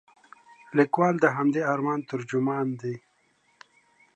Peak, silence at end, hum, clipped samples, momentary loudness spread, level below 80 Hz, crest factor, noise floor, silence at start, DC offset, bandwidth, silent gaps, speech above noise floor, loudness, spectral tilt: -6 dBFS; 1.2 s; none; under 0.1%; 11 LU; -78 dBFS; 20 dB; -67 dBFS; 0.7 s; under 0.1%; 9 kHz; none; 42 dB; -26 LUFS; -7.5 dB/octave